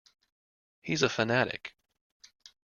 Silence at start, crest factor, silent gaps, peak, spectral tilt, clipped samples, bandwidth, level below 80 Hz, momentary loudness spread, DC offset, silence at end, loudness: 0.85 s; 24 dB; none; -10 dBFS; -4 dB/octave; under 0.1%; 7.4 kHz; -68 dBFS; 19 LU; under 0.1%; 1 s; -29 LUFS